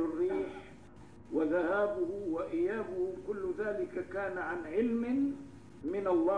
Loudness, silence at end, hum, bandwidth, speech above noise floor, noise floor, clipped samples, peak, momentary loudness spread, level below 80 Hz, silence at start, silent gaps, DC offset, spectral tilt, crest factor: -34 LUFS; 0 s; none; 10 kHz; 22 dB; -54 dBFS; under 0.1%; -20 dBFS; 11 LU; -64 dBFS; 0 s; none; 0.1%; -7.5 dB/octave; 14 dB